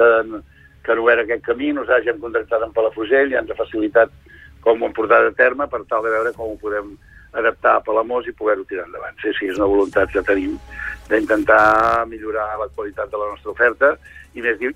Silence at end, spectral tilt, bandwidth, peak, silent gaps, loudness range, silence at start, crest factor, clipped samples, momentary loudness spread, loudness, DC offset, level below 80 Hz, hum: 0 s; -6 dB/octave; 11.5 kHz; -2 dBFS; none; 3 LU; 0 s; 16 dB; under 0.1%; 13 LU; -18 LUFS; under 0.1%; -46 dBFS; none